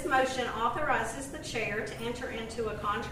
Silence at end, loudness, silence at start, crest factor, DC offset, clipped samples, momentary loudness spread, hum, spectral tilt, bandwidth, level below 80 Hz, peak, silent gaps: 0 s; -32 LUFS; 0 s; 18 dB; under 0.1%; under 0.1%; 8 LU; none; -4 dB/octave; 15.5 kHz; -50 dBFS; -14 dBFS; none